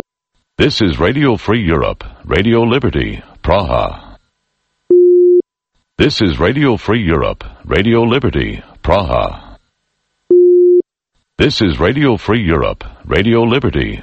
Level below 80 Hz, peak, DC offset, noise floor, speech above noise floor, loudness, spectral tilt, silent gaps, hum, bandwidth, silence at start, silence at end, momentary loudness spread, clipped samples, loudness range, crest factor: -28 dBFS; 0 dBFS; under 0.1%; -67 dBFS; 54 dB; -13 LUFS; -7 dB/octave; none; none; 8 kHz; 0.6 s; 0 s; 13 LU; under 0.1%; 3 LU; 14 dB